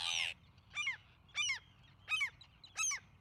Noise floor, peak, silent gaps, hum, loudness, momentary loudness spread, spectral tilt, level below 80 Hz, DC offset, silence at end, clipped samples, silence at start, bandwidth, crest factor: -63 dBFS; -24 dBFS; none; none; -39 LUFS; 14 LU; 2 dB/octave; -72 dBFS; under 0.1%; 0.15 s; under 0.1%; 0 s; 16 kHz; 18 dB